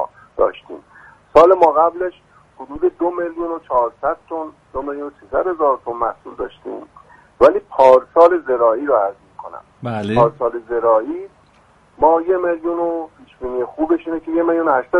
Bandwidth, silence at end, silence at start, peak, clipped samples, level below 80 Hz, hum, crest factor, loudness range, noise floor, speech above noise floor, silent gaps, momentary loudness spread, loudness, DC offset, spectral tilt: 7.4 kHz; 0 s; 0 s; 0 dBFS; under 0.1%; -48 dBFS; none; 18 dB; 7 LU; -52 dBFS; 35 dB; none; 19 LU; -17 LUFS; under 0.1%; -7.5 dB/octave